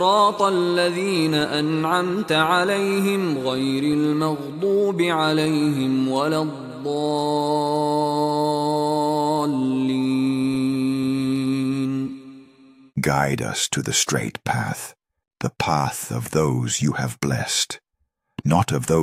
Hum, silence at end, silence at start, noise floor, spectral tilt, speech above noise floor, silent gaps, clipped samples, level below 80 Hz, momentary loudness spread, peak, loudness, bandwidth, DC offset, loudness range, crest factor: none; 0 s; 0 s; -73 dBFS; -4.5 dB/octave; 52 dB; none; under 0.1%; -54 dBFS; 6 LU; -4 dBFS; -21 LUFS; 16 kHz; under 0.1%; 3 LU; 18 dB